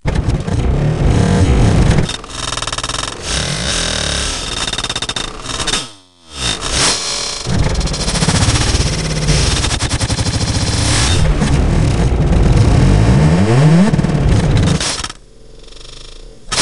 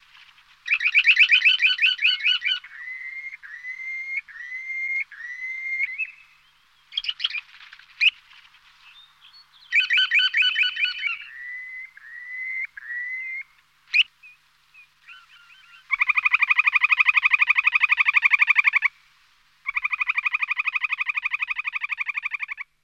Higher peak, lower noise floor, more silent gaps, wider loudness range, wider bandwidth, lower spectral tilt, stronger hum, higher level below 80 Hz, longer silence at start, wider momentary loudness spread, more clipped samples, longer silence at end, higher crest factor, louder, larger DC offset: first, 0 dBFS vs -6 dBFS; second, -38 dBFS vs -60 dBFS; neither; second, 5 LU vs 11 LU; first, 12 kHz vs 9 kHz; first, -4.5 dB/octave vs 4.5 dB/octave; neither; first, -20 dBFS vs -72 dBFS; second, 0.05 s vs 0.65 s; second, 9 LU vs 17 LU; neither; second, 0 s vs 0.2 s; second, 14 dB vs 20 dB; first, -14 LUFS vs -20 LUFS; neither